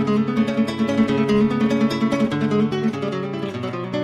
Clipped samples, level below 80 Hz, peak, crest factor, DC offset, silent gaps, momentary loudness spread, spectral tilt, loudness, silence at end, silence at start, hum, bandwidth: under 0.1%; -54 dBFS; -6 dBFS; 12 dB; under 0.1%; none; 8 LU; -7 dB/octave; -21 LUFS; 0 s; 0 s; none; 11 kHz